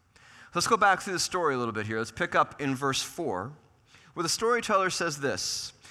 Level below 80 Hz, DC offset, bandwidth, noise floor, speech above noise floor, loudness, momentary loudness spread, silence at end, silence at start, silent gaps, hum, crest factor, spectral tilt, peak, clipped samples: -64 dBFS; under 0.1%; 16 kHz; -58 dBFS; 30 dB; -28 LUFS; 10 LU; 0 s; 0.35 s; none; none; 18 dB; -3 dB/octave; -10 dBFS; under 0.1%